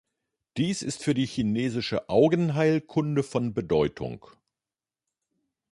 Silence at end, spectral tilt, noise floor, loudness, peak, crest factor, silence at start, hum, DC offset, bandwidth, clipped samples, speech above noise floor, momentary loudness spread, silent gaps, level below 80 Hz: 1.55 s; -6 dB/octave; under -90 dBFS; -26 LUFS; -8 dBFS; 18 dB; 0.55 s; none; under 0.1%; 11.5 kHz; under 0.1%; over 65 dB; 8 LU; none; -56 dBFS